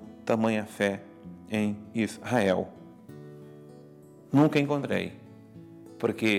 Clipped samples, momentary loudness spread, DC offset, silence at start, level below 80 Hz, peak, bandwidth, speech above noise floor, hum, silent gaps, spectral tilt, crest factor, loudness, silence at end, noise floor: under 0.1%; 25 LU; under 0.1%; 0 s; -74 dBFS; -8 dBFS; 15.5 kHz; 24 dB; none; none; -6.5 dB/octave; 22 dB; -28 LUFS; 0 s; -51 dBFS